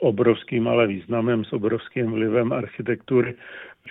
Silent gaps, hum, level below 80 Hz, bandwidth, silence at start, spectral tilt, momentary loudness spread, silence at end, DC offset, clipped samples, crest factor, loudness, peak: none; none; -60 dBFS; 4 kHz; 0 s; -10.5 dB/octave; 8 LU; 0 s; under 0.1%; under 0.1%; 18 dB; -23 LUFS; -6 dBFS